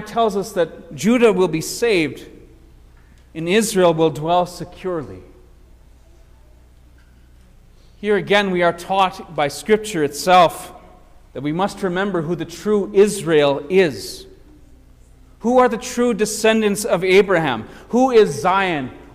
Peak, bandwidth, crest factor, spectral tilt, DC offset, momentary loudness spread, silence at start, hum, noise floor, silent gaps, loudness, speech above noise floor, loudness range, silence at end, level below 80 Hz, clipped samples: -2 dBFS; 16 kHz; 16 dB; -4.5 dB/octave; under 0.1%; 13 LU; 0 s; none; -47 dBFS; none; -18 LUFS; 30 dB; 7 LU; 0.1 s; -48 dBFS; under 0.1%